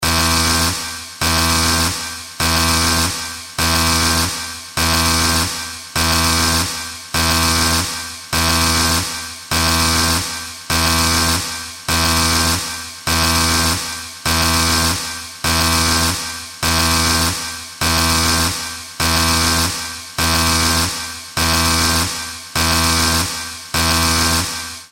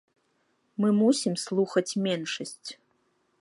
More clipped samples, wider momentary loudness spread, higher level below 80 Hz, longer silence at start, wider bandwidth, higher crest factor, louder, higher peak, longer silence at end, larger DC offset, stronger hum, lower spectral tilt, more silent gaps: neither; second, 10 LU vs 17 LU; first, -30 dBFS vs -80 dBFS; second, 0 s vs 0.8 s; first, 17 kHz vs 11.5 kHz; about the same, 14 dB vs 18 dB; first, -16 LUFS vs -27 LUFS; first, -2 dBFS vs -10 dBFS; second, 0.05 s vs 0.65 s; neither; neither; second, -2.5 dB/octave vs -5 dB/octave; neither